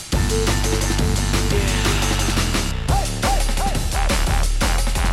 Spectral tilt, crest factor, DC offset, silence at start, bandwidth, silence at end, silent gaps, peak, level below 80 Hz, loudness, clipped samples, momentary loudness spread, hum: -4 dB/octave; 14 dB; under 0.1%; 0 s; 15.5 kHz; 0 s; none; -6 dBFS; -22 dBFS; -20 LUFS; under 0.1%; 3 LU; none